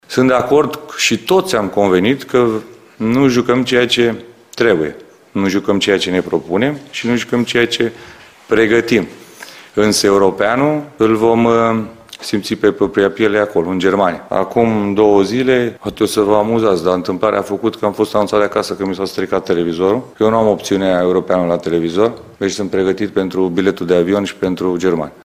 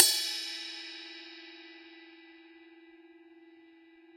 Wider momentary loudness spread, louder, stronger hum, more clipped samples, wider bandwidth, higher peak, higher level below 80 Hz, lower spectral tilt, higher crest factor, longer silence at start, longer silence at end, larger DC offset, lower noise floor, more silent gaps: second, 7 LU vs 25 LU; first, -15 LUFS vs -32 LUFS; neither; neither; about the same, 16 kHz vs 16.5 kHz; about the same, 0 dBFS vs -2 dBFS; first, -48 dBFS vs -88 dBFS; first, -5 dB/octave vs 3 dB/octave; second, 14 dB vs 34 dB; about the same, 0.1 s vs 0 s; second, 0.15 s vs 1.3 s; neither; second, -36 dBFS vs -58 dBFS; neither